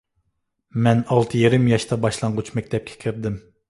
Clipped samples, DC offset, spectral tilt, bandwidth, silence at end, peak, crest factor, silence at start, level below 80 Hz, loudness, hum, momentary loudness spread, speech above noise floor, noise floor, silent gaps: under 0.1%; under 0.1%; -6.5 dB/octave; 11.5 kHz; 0.3 s; -2 dBFS; 18 dB; 0.75 s; -50 dBFS; -21 LUFS; none; 11 LU; 53 dB; -73 dBFS; none